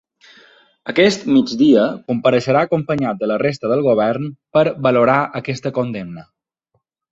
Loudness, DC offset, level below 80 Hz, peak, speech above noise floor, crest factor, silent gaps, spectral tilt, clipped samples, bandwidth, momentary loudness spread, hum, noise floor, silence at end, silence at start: -17 LUFS; under 0.1%; -56 dBFS; -2 dBFS; 53 dB; 16 dB; none; -6.5 dB/octave; under 0.1%; 8 kHz; 11 LU; none; -69 dBFS; 0.9 s; 0.85 s